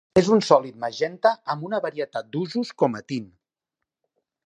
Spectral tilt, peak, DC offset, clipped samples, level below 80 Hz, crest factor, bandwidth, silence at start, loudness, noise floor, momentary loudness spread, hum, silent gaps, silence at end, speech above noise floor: -5.5 dB/octave; -2 dBFS; under 0.1%; under 0.1%; -62 dBFS; 22 dB; 10.5 kHz; 0.15 s; -24 LUFS; -85 dBFS; 13 LU; none; none; 1.2 s; 62 dB